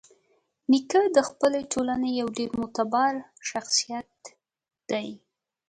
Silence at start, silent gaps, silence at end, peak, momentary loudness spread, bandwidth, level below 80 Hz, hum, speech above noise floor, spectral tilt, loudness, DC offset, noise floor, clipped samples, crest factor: 0.7 s; none; 0.5 s; -6 dBFS; 13 LU; 11 kHz; -64 dBFS; none; 44 dB; -3 dB/octave; -26 LUFS; under 0.1%; -69 dBFS; under 0.1%; 20 dB